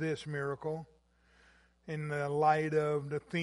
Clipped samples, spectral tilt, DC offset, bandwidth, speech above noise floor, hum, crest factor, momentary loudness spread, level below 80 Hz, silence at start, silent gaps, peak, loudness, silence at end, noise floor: under 0.1%; -7 dB/octave; under 0.1%; 11.5 kHz; 34 dB; none; 20 dB; 14 LU; -68 dBFS; 0 s; none; -16 dBFS; -34 LUFS; 0 s; -67 dBFS